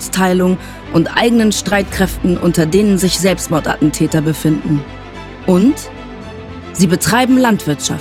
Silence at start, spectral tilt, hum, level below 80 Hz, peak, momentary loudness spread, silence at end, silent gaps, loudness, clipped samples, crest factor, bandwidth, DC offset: 0 s; -5 dB/octave; none; -34 dBFS; 0 dBFS; 18 LU; 0 s; none; -14 LUFS; under 0.1%; 14 dB; 17 kHz; under 0.1%